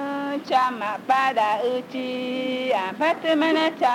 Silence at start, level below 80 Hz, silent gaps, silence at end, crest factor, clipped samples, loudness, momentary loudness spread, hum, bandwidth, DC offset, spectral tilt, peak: 0 s; -76 dBFS; none; 0 s; 14 dB; under 0.1%; -23 LUFS; 8 LU; none; 16.5 kHz; under 0.1%; -4 dB/octave; -8 dBFS